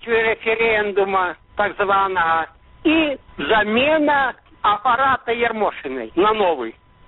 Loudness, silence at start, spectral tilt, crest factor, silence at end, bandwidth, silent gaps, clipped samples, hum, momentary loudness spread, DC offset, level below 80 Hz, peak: -19 LUFS; 0.05 s; -1.5 dB/octave; 16 dB; 0.35 s; 4.2 kHz; none; under 0.1%; none; 8 LU; under 0.1%; -48 dBFS; -4 dBFS